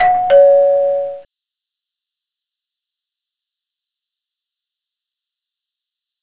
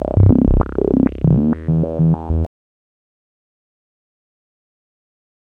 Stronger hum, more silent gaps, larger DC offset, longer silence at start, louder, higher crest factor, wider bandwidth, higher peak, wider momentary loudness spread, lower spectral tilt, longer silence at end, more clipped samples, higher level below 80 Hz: neither; neither; neither; about the same, 0 s vs 0 s; first, -11 LUFS vs -16 LUFS; about the same, 18 dB vs 18 dB; first, 4 kHz vs 3.2 kHz; about the same, 0 dBFS vs 0 dBFS; first, 12 LU vs 8 LU; second, -6.5 dB/octave vs -12.5 dB/octave; first, 5 s vs 3 s; neither; second, -62 dBFS vs -26 dBFS